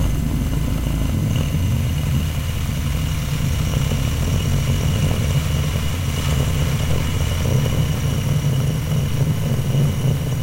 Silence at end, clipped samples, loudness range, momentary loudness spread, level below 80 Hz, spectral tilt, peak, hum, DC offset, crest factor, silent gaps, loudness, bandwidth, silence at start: 0 s; under 0.1%; 1 LU; 3 LU; -26 dBFS; -6 dB/octave; -6 dBFS; none; under 0.1%; 14 dB; none; -20 LUFS; 16 kHz; 0 s